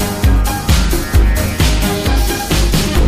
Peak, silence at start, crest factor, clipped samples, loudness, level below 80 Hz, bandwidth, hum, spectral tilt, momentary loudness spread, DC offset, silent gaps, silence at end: 0 dBFS; 0 s; 12 dB; under 0.1%; -14 LUFS; -14 dBFS; 15.5 kHz; none; -4.5 dB/octave; 2 LU; 0.8%; none; 0 s